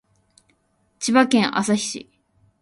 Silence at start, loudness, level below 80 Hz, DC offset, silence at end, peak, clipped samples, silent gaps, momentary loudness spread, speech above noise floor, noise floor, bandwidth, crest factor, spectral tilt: 1 s; -20 LUFS; -64 dBFS; under 0.1%; 0.65 s; -2 dBFS; under 0.1%; none; 12 LU; 47 dB; -66 dBFS; 11.5 kHz; 20 dB; -3.5 dB/octave